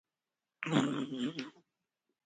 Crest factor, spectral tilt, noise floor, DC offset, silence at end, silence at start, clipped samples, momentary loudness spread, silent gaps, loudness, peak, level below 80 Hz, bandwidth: 26 dB; -5.5 dB/octave; under -90 dBFS; under 0.1%; 0.75 s; 0.6 s; under 0.1%; 13 LU; none; -36 LUFS; -14 dBFS; -80 dBFS; 9.4 kHz